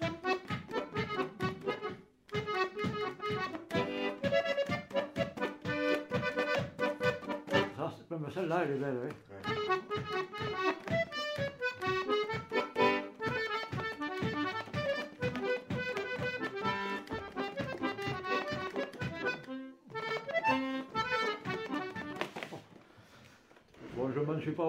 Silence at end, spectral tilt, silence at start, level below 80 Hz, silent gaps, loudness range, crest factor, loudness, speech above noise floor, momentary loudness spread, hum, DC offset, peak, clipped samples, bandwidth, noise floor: 0 s; -5.5 dB/octave; 0 s; -66 dBFS; none; 3 LU; 22 dB; -35 LUFS; 26 dB; 8 LU; none; under 0.1%; -14 dBFS; under 0.1%; 16 kHz; -61 dBFS